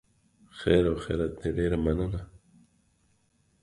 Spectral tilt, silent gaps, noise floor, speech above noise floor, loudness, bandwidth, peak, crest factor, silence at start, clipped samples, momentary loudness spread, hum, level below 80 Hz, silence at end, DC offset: -7.5 dB/octave; none; -69 dBFS; 42 dB; -28 LUFS; 11.5 kHz; -8 dBFS; 22 dB; 0.55 s; under 0.1%; 14 LU; none; -42 dBFS; 1.4 s; under 0.1%